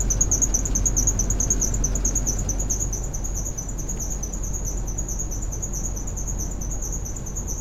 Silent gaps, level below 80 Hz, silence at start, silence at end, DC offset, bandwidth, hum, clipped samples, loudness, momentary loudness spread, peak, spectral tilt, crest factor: none; -28 dBFS; 0 s; 0 s; under 0.1%; 14.5 kHz; none; under 0.1%; -25 LUFS; 9 LU; -6 dBFS; -3.5 dB/octave; 18 dB